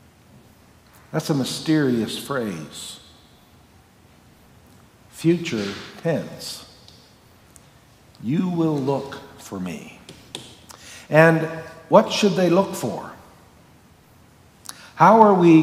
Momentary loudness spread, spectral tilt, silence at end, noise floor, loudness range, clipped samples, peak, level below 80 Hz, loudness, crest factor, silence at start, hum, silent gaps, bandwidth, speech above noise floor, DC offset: 23 LU; -6 dB/octave; 0 s; -52 dBFS; 9 LU; under 0.1%; 0 dBFS; -62 dBFS; -20 LUFS; 22 dB; 1.15 s; none; none; 16 kHz; 33 dB; under 0.1%